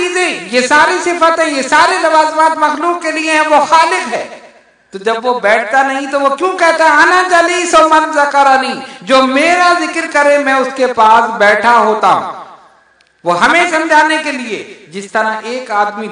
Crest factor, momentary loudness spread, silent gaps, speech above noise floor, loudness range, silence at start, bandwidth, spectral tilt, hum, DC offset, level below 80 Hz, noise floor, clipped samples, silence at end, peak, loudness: 10 dB; 11 LU; none; 39 dB; 4 LU; 0 s; 10.5 kHz; -2.5 dB/octave; none; under 0.1%; -54 dBFS; -50 dBFS; 0.3%; 0 s; 0 dBFS; -10 LUFS